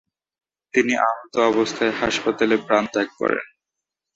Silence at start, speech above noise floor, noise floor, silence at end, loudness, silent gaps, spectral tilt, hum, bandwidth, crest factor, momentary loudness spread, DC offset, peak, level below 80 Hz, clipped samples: 0.75 s; 64 dB; -84 dBFS; 0.7 s; -21 LUFS; none; -4 dB/octave; none; 8 kHz; 18 dB; 5 LU; under 0.1%; -4 dBFS; -58 dBFS; under 0.1%